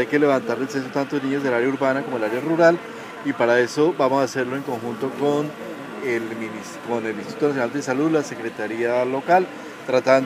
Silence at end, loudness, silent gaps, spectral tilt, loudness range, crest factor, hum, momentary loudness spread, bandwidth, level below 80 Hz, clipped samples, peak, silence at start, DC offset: 0 s; -22 LUFS; none; -5.5 dB/octave; 5 LU; 18 dB; none; 11 LU; 15.5 kHz; -72 dBFS; under 0.1%; -2 dBFS; 0 s; under 0.1%